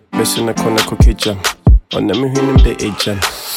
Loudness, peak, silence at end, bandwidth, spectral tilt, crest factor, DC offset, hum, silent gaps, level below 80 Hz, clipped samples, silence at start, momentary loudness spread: -14 LUFS; 0 dBFS; 0 s; 16.5 kHz; -5 dB/octave; 12 dB; under 0.1%; none; none; -16 dBFS; under 0.1%; 0.1 s; 5 LU